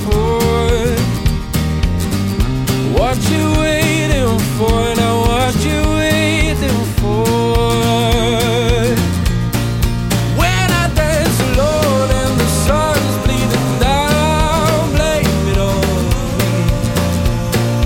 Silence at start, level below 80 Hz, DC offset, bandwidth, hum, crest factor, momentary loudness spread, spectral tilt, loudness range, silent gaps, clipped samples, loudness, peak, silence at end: 0 s; -22 dBFS; 0.3%; 17 kHz; none; 10 dB; 3 LU; -5.5 dB/octave; 1 LU; none; under 0.1%; -14 LUFS; -2 dBFS; 0 s